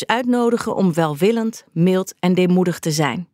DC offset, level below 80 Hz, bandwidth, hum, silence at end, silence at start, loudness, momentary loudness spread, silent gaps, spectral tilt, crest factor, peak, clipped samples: under 0.1%; -64 dBFS; 16 kHz; none; 0.1 s; 0 s; -18 LUFS; 4 LU; none; -6 dB/octave; 16 dB; -2 dBFS; under 0.1%